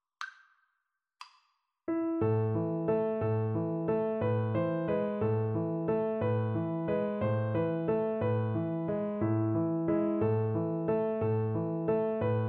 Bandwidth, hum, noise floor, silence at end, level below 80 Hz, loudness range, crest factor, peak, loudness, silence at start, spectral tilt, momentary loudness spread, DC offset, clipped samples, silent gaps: 5.2 kHz; none; -83 dBFS; 0 s; -62 dBFS; 2 LU; 12 dB; -18 dBFS; -31 LUFS; 0.2 s; -10.5 dB/octave; 3 LU; under 0.1%; under 0.1%; none